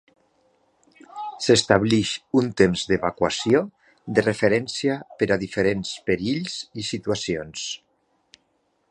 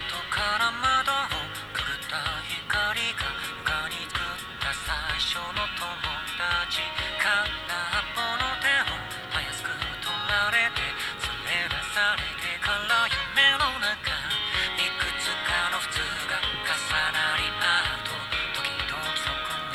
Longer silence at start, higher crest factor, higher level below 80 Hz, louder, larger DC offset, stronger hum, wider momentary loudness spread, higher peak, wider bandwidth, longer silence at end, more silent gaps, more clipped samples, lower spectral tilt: first, 1.15 s vs 0 s; about the same, 22 dB vs 20 dB; second, -52 dBFS vs -46 dBFS; first, -23 LUFS vs -26 LUFS; neither; neither; first, 12 LU vs 7 LU; first, -2 dBFS vs -6 dBFS; second, 10.5 kHz vs over 20 kHz; first, 1.15 s vs 0 s; neither; neither; first, -4.5 dB/octave vs -1.5 dB/octave